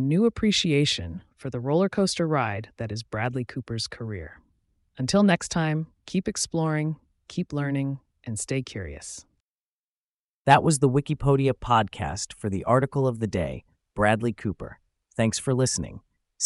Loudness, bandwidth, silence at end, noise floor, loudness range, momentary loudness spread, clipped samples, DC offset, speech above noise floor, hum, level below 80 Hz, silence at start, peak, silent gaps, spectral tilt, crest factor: -25 LUFS; 11.5 kHz; 0 s; under -90 dBFS; 6 LU; 15 LU; under 0.1%; under 0.1%; over 65 dB; none; -50 dBFS; 0 s; -4 dBFS; 9.40-10.45 s; -5 dB/octave; 22 dB